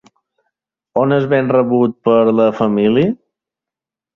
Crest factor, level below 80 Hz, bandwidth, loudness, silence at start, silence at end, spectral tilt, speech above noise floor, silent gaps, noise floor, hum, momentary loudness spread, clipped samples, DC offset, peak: 14 dB; -56 dBFS; 6.4 kHz; -14 LUFS; 0.95 s; 1 s; -9 dB/octave; 74 dB; none; -87 dBFS; none; 6 LU; under 0.1%; under 0.1%; -2 dBFS